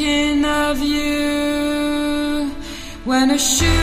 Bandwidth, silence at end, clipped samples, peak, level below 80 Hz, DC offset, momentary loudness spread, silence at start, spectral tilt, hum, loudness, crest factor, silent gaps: 15.5 kHz; 0 s; under 0.1%; -4 dBFS; -30 dBFS; under 0.1%; 10 LU; 0 s; -3.5 dB/octave; none; -18 LUFS; 14 dB; none